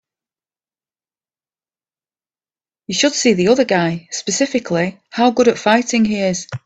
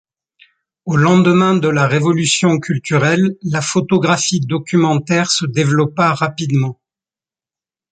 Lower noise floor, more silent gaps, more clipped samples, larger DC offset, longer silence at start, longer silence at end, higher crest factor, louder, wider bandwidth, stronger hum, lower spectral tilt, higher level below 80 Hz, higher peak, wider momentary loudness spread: about the same, under -90 dBFS vs under -90 dBFS; neither; neither; neither; first, 2.9 s vs 0.85 s; second, 0.1 s vs 1.2 s; about the same, 18 dB vs 14 dB; about the same, -16 LUFS vs -15 LUFS; about the same, 9 kHz vs 9.4 kHz; neither; about the same, -4 dB/octave vs -5 dB/octave; about the same, -58 dBFS vs -54 dBFS; about the same, 0 dBFS vs -2 dBFS; about the same, 7 LU vs 6 LU